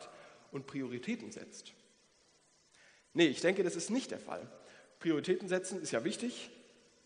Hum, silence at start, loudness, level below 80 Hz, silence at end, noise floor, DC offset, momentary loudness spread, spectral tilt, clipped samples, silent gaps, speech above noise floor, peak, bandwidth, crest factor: none; 0 s; -36 LUFS; -86 dBFS; 0.45 s; -69 dBFS; under 0.1%; 21 LU; -4 dB/octave; under 0.1%; none; 33 dB; -14 dBFS; 10 kHz; 24 dB